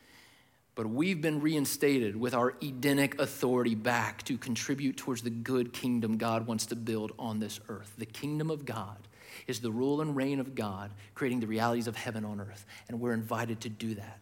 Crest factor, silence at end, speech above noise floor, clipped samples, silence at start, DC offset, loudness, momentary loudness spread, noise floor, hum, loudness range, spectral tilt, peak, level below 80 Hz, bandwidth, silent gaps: 20 dB; 0 s; 31 dB; under 0.1%; 0.15 s; under 0.1%; -33 LUFS; 13 LU; -64 dBFS; none; 5 LU; -5 dB/octave; -14 dBFS; -72 dBFS; 17 kHz; none